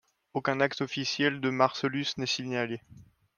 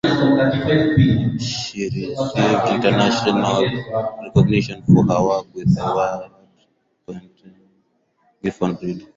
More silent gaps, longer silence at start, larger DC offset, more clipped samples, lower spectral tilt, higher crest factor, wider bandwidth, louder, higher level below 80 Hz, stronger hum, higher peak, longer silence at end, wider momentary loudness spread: neither; first, 0.35 s vs 0.05 s; neither; neither; second, -4.5 dB/octave vs -6.5 dB/octave; first, 24 dB vs 16 dB; first, 10 kHz vs 7.8 kHz; second, -29 LUFS vs -18 LUFS; second, -70 dBFS vs -44 dBFS; neither; second, -8 dBFS vs -2 dBFS; first, 0.35 s vs 0.1 s; second, 7 LU vs 12 LU